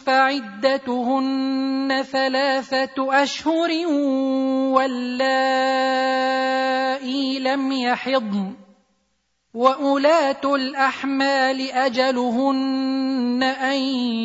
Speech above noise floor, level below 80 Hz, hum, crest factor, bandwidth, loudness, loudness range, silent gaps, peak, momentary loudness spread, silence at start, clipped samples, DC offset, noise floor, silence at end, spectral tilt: 50 dB; -70 dBFS; none; 18 dB; 7.8 kHz; -20 LUFS; 2 LU; none; -2 dBFS; 4 LU; 0.05 s; under 0.1%; under 0.1%; -70 dBFS; 0 s; -4 dB/octave